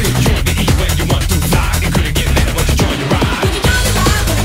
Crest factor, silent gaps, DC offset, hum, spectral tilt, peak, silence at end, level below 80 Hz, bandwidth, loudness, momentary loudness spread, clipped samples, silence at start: 12 dB; none; under 0.1%; none; -4.5 dB/octave; 0 dBFS; 0 s; -18 dBFS; 16.5 kHz; -14 LUFS; 2 LU; under 0.1%; 0 s